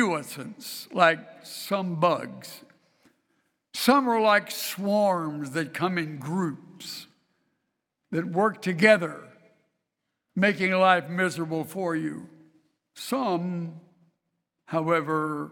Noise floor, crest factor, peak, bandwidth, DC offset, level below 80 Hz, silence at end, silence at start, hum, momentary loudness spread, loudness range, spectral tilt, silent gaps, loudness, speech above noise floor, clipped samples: -82 dBFS; 24 dB; -4 dBFS; 19 kHz; under 0.1%; -74 dBFS; 0 s; 0 s; none; 17 LU; 7 LU; -5 dB/octave; none; -25 LUFS; 56 dB; under 0.1%